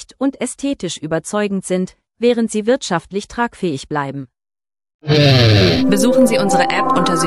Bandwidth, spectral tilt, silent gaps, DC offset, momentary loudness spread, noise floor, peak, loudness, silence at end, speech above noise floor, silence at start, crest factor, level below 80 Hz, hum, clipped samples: 14.5 kHz; -5 dB/octave; 4.94-4.99 s; under 0.1%; 11 LU; under -90 dBFS; -2 dBFS; -16 LUFS; 0 s; over 75 dB; 0 s; 14 dB; -44 dBFS; none; under 0.1%